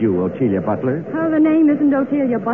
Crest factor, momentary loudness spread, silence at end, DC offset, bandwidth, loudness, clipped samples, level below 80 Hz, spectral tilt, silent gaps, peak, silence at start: 10 dB; 7 LU; 0 s; 0.2%; 3.4 kHz; -17 LUFS; under 0.1%; -56 dBFS; -11 dB/octave; none; -6 dBFS; 0 s